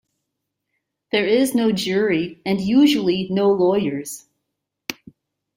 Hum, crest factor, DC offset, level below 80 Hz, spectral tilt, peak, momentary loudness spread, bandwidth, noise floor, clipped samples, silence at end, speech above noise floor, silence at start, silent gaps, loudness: none; 16 dB; under 0.1%; -60 dBFS; -5 dB/octave; -4 dBFS; 17 LU; 16 kHz; -79 dBFS; under 0.1%; 0.65 s; 61 dB; 1.15 s; none; -19 LUFS